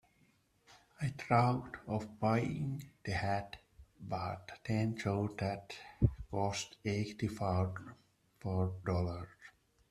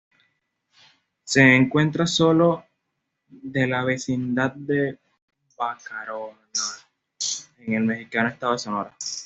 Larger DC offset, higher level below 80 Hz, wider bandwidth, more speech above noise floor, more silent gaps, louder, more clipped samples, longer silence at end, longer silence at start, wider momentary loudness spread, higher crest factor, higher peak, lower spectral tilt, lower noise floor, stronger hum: neither; first, -56 dBFS vs -62 dBFS; first, 13 kHz vs 8.2 kHz; second, 36 dB vs 56 dB; second, none vs 5.22-5.28 s; second, -37 LUFS vs -22 LUFS; neither; first, 0.4 s vs 0 s; second, 0.7 s vs 1.25 s; about the same, 13 LU vs 14 LU; about the same, 22 dB vs 22 dB; second, -14 dBFS vs -2 dBFS; first, -6.5 dB/octave vs -4.5 dB/octave; second, -72 dBFS vs -78 dBFS; neither